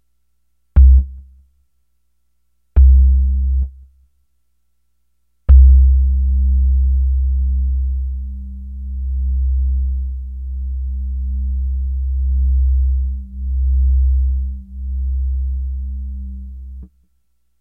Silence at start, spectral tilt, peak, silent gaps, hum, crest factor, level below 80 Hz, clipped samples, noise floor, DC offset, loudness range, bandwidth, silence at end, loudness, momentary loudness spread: 0.75 s; -12 dB/octave; 0 dBFS; none; 60 Hz at -45 dBFS; 16 dB; -16 dBFS; under 0.1%; -69 dBFS; under 0.1%; 7 LU; 0.8 kHz; 0.75 s; -17 LUFS; 17 LU